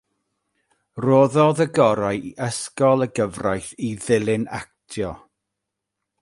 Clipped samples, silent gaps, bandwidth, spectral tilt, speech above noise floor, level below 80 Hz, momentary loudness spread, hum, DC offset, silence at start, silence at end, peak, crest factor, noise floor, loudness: under 0.1%; none; 11.5 kHz; -6 dB/octave; 62 dB; -54 dBFS; 13 LU; none; under 0.1%; 0.95 s; 1.05 s; -2 dBFS; 20 dB; -82 dBFS; -21 LUFS